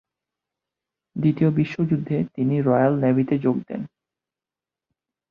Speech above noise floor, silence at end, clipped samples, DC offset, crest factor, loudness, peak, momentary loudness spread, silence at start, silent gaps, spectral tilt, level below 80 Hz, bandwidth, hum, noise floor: 69 dB; 1.45 s; under 0.1%; under 0.1%; 18 dB; -22 LUFS; -6 dBFS; 14 LU; 1.15 s; none; -10.5 dB/octave; -60 dBFS; 6.2 kHz; none; -90 dBFS